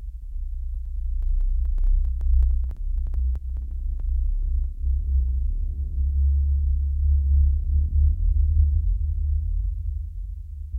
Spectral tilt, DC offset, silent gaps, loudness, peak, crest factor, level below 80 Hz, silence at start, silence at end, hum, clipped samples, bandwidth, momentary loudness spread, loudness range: -11 dB/octave; under 0.1%; none; -26 LUFS; -8 dBFS; 14 dB; -22 dBFS; 0 s; 0 s; none; under 0.1%; 0.6 kHz; 12 LU; 5 LU